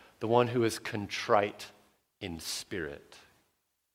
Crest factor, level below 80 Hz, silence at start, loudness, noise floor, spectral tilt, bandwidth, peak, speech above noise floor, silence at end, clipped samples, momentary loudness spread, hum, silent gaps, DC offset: 24 dB; -64 dBFS; 0.2 s; -31 LUFS; -78 dBFS; -4.5 dB/octave; 16.5 kHz; -10 dBFS; 47 dB; 0.75 s; under 0.1%; 17 LU; none; none; under 0.1%